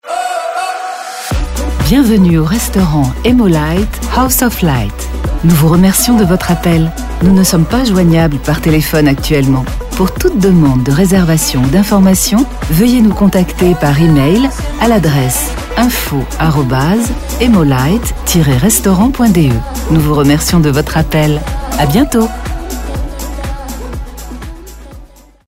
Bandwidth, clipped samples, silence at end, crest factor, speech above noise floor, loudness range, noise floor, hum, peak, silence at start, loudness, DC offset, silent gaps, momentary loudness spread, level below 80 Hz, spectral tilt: 16.5 kHz; under 0.1%; 0.4 s; 10 dB; 27 dB; 3 LU; -36 dBFS; none; 0 dBFS; 0.05 s; -11 LUFS; 0.6%; none; 12 LU; -20 dBFS; -5.5 dB/octave